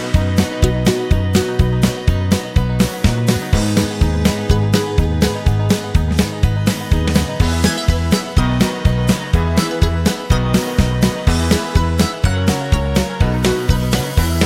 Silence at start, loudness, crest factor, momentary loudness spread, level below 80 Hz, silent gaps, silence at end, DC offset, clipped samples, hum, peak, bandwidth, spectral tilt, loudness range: 0 s; -16 LUFS; 14 dB; 2 LU; -22 dBFS; none; 0 s; under 0.1%; under 0.1%; none; 0 dBFS; 16.5 kHz; -5.5 dB/octave; 0 LU